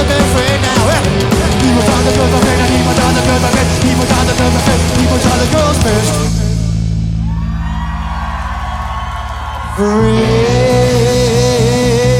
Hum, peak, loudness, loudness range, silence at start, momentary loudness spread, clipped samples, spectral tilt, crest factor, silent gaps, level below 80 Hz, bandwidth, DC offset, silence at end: none; 0 dBFS; -12 LUFS; 6 LU; 0 s; 9 LU; under 0.1%; -5 dB/octave; 12 dB; none; -22 dBFS; 16.5 kHz; under 0.1%; 0 s